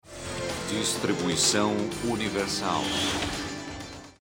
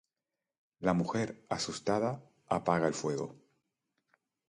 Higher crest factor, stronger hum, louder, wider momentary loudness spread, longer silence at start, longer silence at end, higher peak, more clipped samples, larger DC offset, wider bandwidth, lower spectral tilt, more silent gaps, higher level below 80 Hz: about the same, 20 dB vs 24 dB; neither; first, -27 LUFS vs -33 LUFS; first, 14 LU vs 7 LU; second, 0.05 s vs 0.8 s; second, 0.1 s vs 1.15 s; about the same, -10 dBFS vs -12 dBFS; neither; neither; first, 16.5 kHz vs 11 kHz; second, -3 dB/octave vs -5.5 dB/octave; neither; first, -52 dBFS vs -66 dBFS